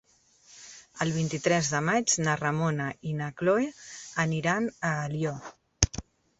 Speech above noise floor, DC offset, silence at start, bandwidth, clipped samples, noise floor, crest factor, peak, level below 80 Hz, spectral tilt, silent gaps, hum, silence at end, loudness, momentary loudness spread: 32 dB; under 0.1%; 0.5 s; 8.4 kHz; under 0.1%; -60 dBFS; 30 dB; 0 dBFS; -48 dBFS; -4 dB/octave; none; none; 0.4 s; -28 LUFS; 17 LU